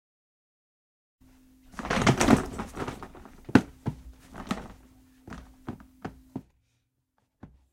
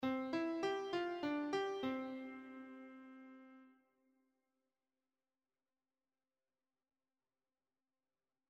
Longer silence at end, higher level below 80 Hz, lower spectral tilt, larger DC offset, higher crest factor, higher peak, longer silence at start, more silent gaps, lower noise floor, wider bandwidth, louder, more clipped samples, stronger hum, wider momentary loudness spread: second, 0.25 s vs 4.8 s; first, -48 dBFS vs -86 dBFS; about the same, -5.5 dB/octave vs -5 dB/octave; neither; first, 30 dB vs 18 dB; first, -2 dBFS vs -28 dBFS; first, 1.75 s vs 0 s; neither; second, -76 dBFS vs under -90 dBFS; first, 16.5 kHz vs 14.5 kHz; first, -27 LUFS vs -42 LUFS; neither; neither; first, 24 LU vs 18 LU